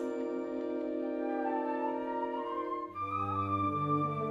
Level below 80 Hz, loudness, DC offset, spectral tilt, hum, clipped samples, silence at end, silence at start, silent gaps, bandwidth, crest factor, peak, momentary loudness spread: -72 dBFS; -35 LUFS; under 0.1%; -9 dB/octave; none; under 0.1%; 0 s; 0 s; none; 7.6 kHz; 14 dB; -20 dBFS; 5 LU